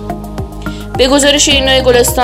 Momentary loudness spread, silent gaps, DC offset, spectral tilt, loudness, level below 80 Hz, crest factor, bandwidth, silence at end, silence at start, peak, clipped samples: 16 LU; none; under 0.1%; -2.5 dB/octave; -8 LUFS; -24 dBFS; 10 dB; 16.5 kHz; 0 s; 0 s; 0 dBFS; 0.4%